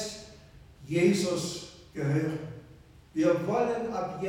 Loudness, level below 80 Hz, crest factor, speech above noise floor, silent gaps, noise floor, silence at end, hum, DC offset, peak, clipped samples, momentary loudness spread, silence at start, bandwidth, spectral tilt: -29 LUFS; -58 dBFS; 18 dB; 26 dB; none; -53 dBFS; 0 s; none; under 0.1%; -12 dBFS; under 0.1%; 18 LU; 0 s; 16.5 kHz; -5.5 dB/octave